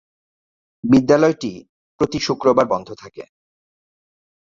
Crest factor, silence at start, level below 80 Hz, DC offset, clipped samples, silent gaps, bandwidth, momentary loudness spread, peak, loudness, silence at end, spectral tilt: 18 dB; 0.85 s; -52 dBFS; under 0.1%; under 0.1%; 1.69-1.99 s; 7.6 kHz; 20 LU; -2 dBFS; -17 LUFS; 1.3 s; -6 dB/octave